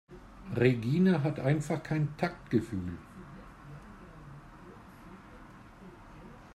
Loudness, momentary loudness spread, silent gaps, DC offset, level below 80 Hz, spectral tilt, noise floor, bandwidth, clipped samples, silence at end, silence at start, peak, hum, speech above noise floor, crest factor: -30 LUFS; 25 LU; none; under 0.1%; -56 dBFS; -8 dB/octave; -52 dBFS; 12.5 kHz; under 0.1%; 0 s; 0.1 s; -12 dBFS; none; 22 dB; 20 dB